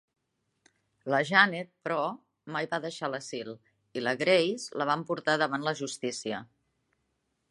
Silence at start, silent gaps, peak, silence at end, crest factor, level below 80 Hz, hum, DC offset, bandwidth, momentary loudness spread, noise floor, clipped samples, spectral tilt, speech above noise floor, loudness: 1.05 s; none; -6 dBFS; 1.05 s; 26 dB; -80 dBFS; none; under 0.1%; 11.5 kHz; 16 LU; -78 dBFS; under 0.1%; -4 dB/octave; 49 dB; -29 LUFS